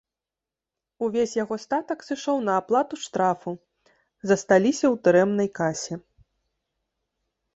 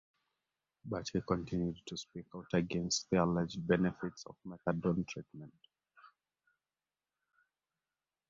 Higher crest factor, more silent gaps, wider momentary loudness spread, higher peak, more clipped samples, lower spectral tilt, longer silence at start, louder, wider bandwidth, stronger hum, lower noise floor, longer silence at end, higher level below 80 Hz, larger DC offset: about the same, 20 dB vs 22 dB; neither; second, 13 LU vs 17 LU; first, -6 dBFS vs -16 dBFS; neither; about the same, -5 dB/octave vs -5.5 dB/octave; first, 1 s vs 0.85 s; first, -24 LUFS vs -36 LUFS; first, 8.2 kHz vs 7.4 kHz; neither; about the same, -89 dBFS vs under -90 dBFS; second, 1.55 s vs 2.2 s; about the same, -66 dBFS vs -62 dBFS; neither